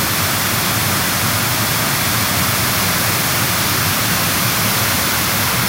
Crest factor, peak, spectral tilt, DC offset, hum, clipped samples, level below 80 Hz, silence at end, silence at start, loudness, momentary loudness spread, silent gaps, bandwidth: 14 dB; -2 dBFS; -2.5 dB/octave; under 0.1%; none; under 0.1%; -40 dBFS; 0 s; 0 s; -15 LUFS; 1 LU; none; 16 kHz